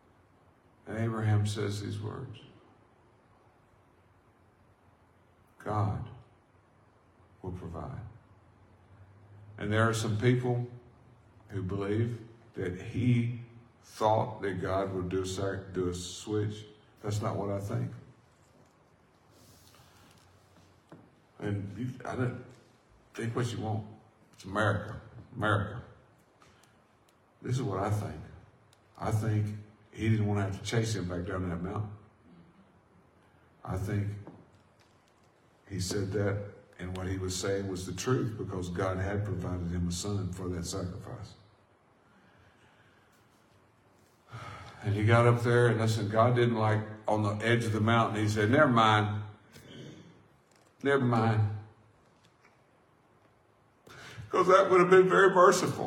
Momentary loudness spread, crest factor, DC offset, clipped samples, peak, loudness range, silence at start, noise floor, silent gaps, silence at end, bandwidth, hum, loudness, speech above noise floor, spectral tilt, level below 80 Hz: 22 LU; 24 dB; under 0.1%; under 0.1%; -8 dBFS; 14 LU; 0.85 s; -65 dBFS; none; 0 s; 14.5 kHz; none; -30 LUFS; 36 dB; -6 dB/octave; -64 dBFS